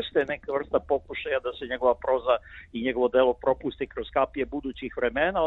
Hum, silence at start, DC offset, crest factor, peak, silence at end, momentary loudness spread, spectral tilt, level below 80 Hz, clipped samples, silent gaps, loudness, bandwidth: none; 0 s; under 0.1%; 18 dB; -8 dBFS; 0 s; 9 LU; -7.5 dB/octave; -50 dBFS; under 0.1%; none; -27 LUFS; 4.1 kHz